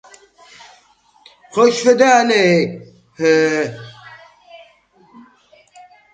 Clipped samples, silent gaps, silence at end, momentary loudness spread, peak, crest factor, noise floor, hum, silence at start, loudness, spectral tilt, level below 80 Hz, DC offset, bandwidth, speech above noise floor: under 0.1%; none; 2.25 s; 19 LU; 0 dBFS; 18 dB; -53 dBFS; none; 1.55 s; -14 LUFS; -4.5 dB/octave; -64 dBFS; under 0.1%; 9.2 kHz; 40 dB